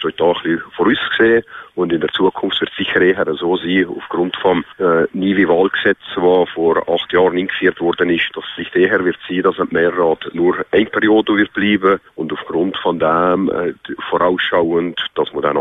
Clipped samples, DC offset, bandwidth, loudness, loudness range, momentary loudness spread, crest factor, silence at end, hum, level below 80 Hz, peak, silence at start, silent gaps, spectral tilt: under 0.1%; under 0.1%; 4 kHz; -16 LUFS; 2 LU; 7 LU; 14 dB; 0 s; none; -52 dBFS; -2 dBFS; 0 s; none; -8 dB/octave